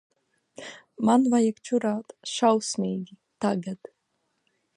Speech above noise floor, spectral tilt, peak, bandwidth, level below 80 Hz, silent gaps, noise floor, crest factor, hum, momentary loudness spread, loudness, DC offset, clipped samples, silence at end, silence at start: 51 dB; -5 dB/octave; -8 dBFS; 11 kHz; -76 dBFS; none; -75 dBFS; 20 dB; none; 21 LU; -25 LUFS; under 0.1%; under 0.1%; 1 s; 0.6 s